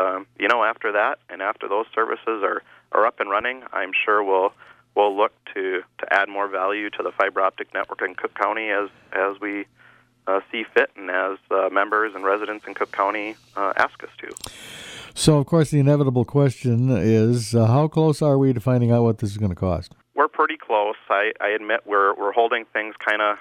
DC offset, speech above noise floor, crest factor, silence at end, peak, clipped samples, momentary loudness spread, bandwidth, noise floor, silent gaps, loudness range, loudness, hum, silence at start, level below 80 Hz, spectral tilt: under 0.1%; 33 dB; 18 dB; 0 s; -4 dBFS; under 0.1%; 10 LU; 14.5 kHz; -54 dBFS; none; 6 LU; -22 LUFS; none; 0 s; -54 dBFS; -6 dB/octave